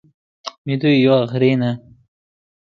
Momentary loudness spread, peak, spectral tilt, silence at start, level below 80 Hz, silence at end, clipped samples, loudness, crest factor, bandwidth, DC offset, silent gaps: 18 LU; -2 dBFS; -7.5 dB/octave; 0.45 s; -62 dBFS; 0.9 s; under 0.1%; -16 LUFS; 18 dB; 7 kHz; under 0.1%; 0.58-0.65 s